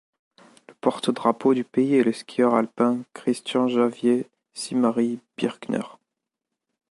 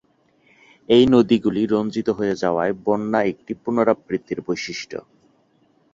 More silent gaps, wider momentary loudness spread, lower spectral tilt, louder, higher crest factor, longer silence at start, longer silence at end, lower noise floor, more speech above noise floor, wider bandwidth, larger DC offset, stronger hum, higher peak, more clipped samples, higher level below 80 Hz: neither; second, 9 LU vs 13 LU; about the same, -5.5 dB/octave vs -6 dB/octave; second, -23 LUFS vs -20 LUFS; about the same, 18 dB vs 18 dB; about the same, 0.85 s vs 0.9 s; about the same, 1 s vs 0.95 s; first, -84 dBFS vs -61 dBFS; first, 62 dB vs 41 dB; first, 11.5 kHz vs 7.6 kHz; neither; neither; second, -6 dBFS vs -2 dBFS; neither; second, -74 dBFS vs -54 dBFS